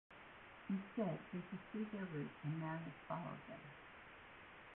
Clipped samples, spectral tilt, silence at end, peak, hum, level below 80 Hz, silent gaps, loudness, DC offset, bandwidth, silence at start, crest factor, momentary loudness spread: under 0.1%; -6.5 dB/octave; 0 s; -30 dBFS; none; -76 dBFS; none; -48 LUFS; under 0.1%; 4 kHz; 0.1 s; 18 dB; 14 LU